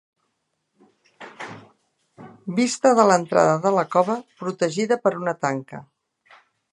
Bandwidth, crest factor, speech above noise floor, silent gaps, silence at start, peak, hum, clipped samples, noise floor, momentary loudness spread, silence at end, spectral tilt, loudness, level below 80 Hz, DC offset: 11.5 kHz; 22 dB; 54 dB; none; 1.2 s; -2 dBFS; none; under 0.1%; -75 dBFS; 21 LU; 0.9 s; -5 dB/octave; -21 LUFS; -72 dBFS; under 0.1%